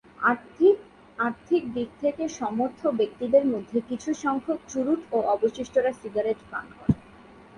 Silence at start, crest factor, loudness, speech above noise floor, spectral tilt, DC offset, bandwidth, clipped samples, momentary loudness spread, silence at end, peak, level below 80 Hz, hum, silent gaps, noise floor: 0.2 s; 18 dB; -26 LUFS; 24 dB; -6.5 dB/octave; under 0.1%; 11 kHz; under 0.1%; 8 LU; 0.6 s; -8 dBFS; -54 dBFS; none; none; -50 dBFS